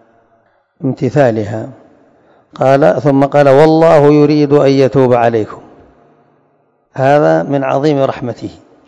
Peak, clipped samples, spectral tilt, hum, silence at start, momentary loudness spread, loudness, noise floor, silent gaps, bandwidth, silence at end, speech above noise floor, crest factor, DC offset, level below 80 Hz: 0 dBFS; 1%; -8 dB/octave; none; 0.8 s; 16 LU; -10 LUFS; -56 dBFS; none; 11 kHz; 0.35 s; 46 dB; 12 dB; under 0.1%; -50 dBFS